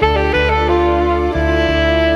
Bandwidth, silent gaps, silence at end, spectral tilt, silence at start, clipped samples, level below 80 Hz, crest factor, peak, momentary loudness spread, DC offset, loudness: 7.4 kHz; none; 0 s; -7 dB/octave; 0 s; under 0.1%; -22 dBFS; 12 dB; -2 dBFS; 2 LU; under 0.1%; -14 LUFS